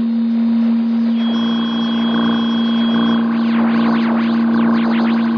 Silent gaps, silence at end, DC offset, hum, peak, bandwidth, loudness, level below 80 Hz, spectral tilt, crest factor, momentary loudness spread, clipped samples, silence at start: none; 0 s; under 0.1%; none; -6 dBFS; 5.4 kHz; -15 LUFS; -58 dBFS; -7 dB/octave; 8 dB; 2 LU; under 0.1%; 0 s